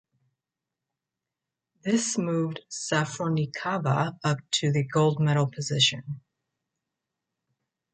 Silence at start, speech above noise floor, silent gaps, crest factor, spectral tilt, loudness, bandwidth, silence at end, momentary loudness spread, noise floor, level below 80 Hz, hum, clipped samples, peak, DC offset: 1.85 s; 62 dB; none; 20 dB; -4.5 dB/octave; -26 LUFS; 9.4 kHz; 1.75 s; 10 LU; -88 dBFS; -68 dBFS; none; under 0.1%; -8 dBFS; under 0.1%